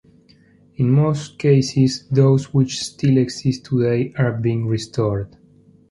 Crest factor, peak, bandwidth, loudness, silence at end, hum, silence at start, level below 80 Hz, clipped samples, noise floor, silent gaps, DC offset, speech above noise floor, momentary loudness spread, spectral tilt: 16 dB; -2 dBFS; 11.5 kHz; -19 LUFS; 0.65 s; none; 0.8 s; -50 dBFS; under 0.1%; -52 dBFS; none; under 0.1%; 34 dB; 7 LU; -7 dB/octave